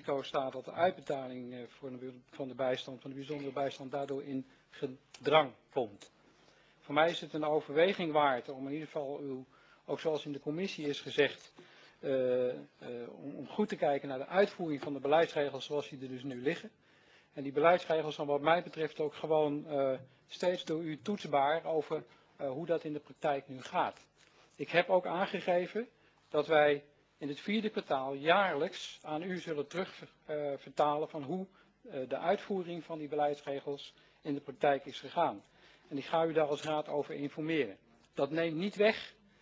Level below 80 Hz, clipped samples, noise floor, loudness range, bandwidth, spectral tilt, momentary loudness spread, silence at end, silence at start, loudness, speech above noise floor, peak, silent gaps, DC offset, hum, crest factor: -80 dBFS; under 0.1%; -65 dBFS; 5 LU; 8 kHz; -5.5 dB/octave; 15 LU; 0.3 s; 0.05 s; -35 LUFS; 31 dB; -12 dBFS; none; under 0.1%; none; 24 dB